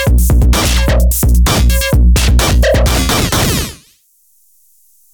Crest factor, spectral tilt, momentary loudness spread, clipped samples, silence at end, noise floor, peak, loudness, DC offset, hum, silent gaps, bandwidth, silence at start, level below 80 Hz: 8 dB; -4.5 dB/octave; 2 LU; under 0.1%; 1.4 s; -52 dBFS; -2 dBFS; -11 LUFS; under 0.1%; none; none; 20 kHz; 0 s; -12 dBFS